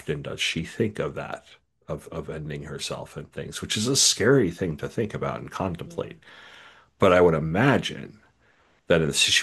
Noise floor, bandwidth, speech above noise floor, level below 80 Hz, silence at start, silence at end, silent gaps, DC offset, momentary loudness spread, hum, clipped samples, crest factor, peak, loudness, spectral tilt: -62 dBFS; 12.5 kHz; 37 dB; -54 dBFS; 0.05 s; 0 s; none; under 0.1%; 18 LU; none; under 0.1%; 22 dB; -4 dBFS; -24 LUFS; -3.5 dB/octave